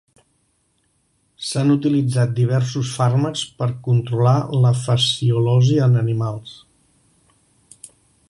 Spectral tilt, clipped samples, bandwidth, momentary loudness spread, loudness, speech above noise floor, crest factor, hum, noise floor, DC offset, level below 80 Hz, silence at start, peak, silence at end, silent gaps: -6.5 dB/octave; under 0.1%; 11.5 kHz; 9 LU; -18 LUFS; 48 dB; 14 dB; none; -65 dBFS; under 0.1%; -56 dBFS; 1.4 s; -4 dBFS; 1.8 s; none